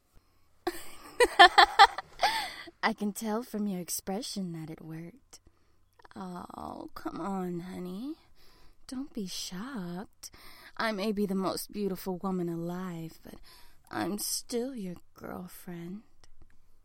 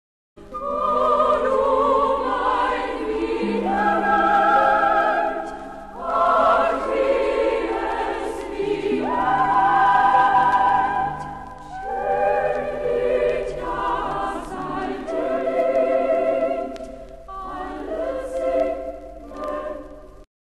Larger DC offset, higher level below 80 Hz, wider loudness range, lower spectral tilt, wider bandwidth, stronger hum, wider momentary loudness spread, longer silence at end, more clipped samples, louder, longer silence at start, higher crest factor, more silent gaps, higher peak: second, under 0.1% vs 0.4%; second, -58 dBFS vs -44 dBFS; first, 16 LU vs 5 LU; second, -3.5 dB/octave vs -5.5 dB/octave; first, 16.5 kHz vs 12 kHz; neither; first, 22 LU vs 16 LU; second, 0.1 s vs 0.3 s; neither; second, -29 LUFS vs -21 LUFS; first, 0.65 s vs 0.35 s; first, 28 dB vs 14 dB; neither; about the same, -4 dBFS vs -6 dBFS